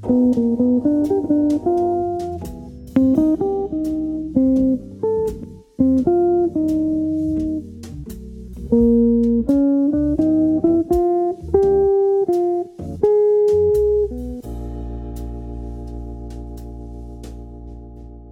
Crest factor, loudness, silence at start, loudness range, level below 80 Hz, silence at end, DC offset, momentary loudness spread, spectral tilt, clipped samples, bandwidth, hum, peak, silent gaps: 16 dB; -18 LUFS; 0 s; 9 LU; -36 dBFS; 0 s; under 0.1%; 19 LU; -9.5 dB/octave; under 0.1%; 14 kHz; none; -2 dBFS; none